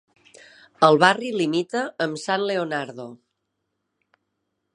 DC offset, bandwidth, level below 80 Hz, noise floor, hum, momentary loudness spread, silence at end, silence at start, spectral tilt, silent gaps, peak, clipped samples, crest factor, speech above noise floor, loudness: under 0.1%; 11 kHz; -76 dBFS; -78 dBFS; none; 16 LU; 1.6 s; 0.8 s; -4.5 dB/octave; none; 0 dBFS; under 0.1%; 24 dB; 56 dB; -21 LUFS